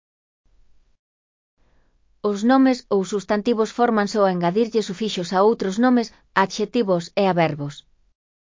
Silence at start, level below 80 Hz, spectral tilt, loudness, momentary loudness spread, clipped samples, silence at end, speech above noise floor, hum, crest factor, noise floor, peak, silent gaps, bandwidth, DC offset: 2.25 s; -62 dBFS; -6 dB/octave; -20 LUFS; 6 LU; under 0.1%; 0.7 s; 40 dB; none; 18 dB; -59 dBFS; -2 dBFS; none; 7.6 kHz; under 0.1%